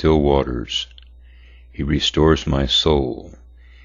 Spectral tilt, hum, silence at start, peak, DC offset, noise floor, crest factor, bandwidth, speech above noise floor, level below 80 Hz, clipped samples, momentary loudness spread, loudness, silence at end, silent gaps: -5.5 dB/octave; none; 0 s; -2 dBFS; under 0.1%; -44 dBFS; 18 dB; 7.6 kHz; 26 dB; -30 dBFS; under 0.1%; 15 LU; -18 LUFS; 0.5 s; none